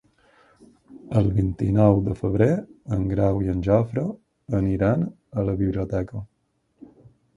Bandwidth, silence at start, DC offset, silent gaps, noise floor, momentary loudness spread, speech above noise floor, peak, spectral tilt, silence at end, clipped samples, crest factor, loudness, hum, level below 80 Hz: 7.2 kHz; 0.9 s; under 0.1%; none; -69 dBFS; 10 LU; 47 dB; -2 dBFS; -10 dB/octave; 1.1 s; under 0.1%; 20 dB; -23 LUFS; none; -40 dBFS